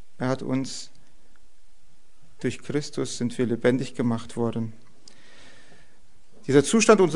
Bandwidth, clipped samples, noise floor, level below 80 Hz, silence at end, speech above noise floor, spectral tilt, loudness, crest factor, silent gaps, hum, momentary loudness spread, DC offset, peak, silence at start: 11 kHz; under 0.1%; -59 dBFS; -60 dBFS; 0 s; 36 dB; -5 dB/octave; -25 LUFS; 22 dB; none; none; 16 LU; 2%; -4 dBFS; 0.2 s